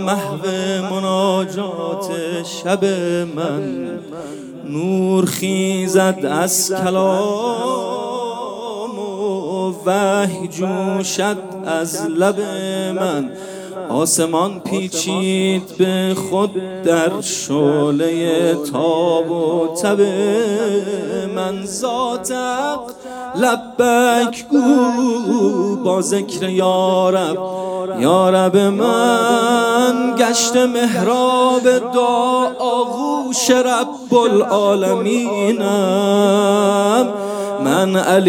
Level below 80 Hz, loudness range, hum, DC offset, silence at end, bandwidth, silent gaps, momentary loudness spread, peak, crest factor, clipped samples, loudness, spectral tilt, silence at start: -64 dBFS; 6 LU; none; under 0.1%; 0 s; over 20 kHz; none; 9 LU; 0 dBFS; 16 dB; under 0.1%; -17 LUFS; -4.5 dB/octave; 0 s